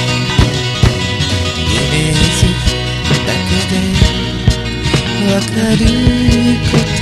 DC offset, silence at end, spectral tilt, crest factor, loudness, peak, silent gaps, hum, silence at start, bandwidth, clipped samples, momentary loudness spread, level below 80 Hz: 0.4%; 0 s; -5 dB/octave; 12 dB; -13 LUFS; 0 dBFS; none; none; 0 s; 14 kHz; 0.3%; 4 LU; -20 dBFS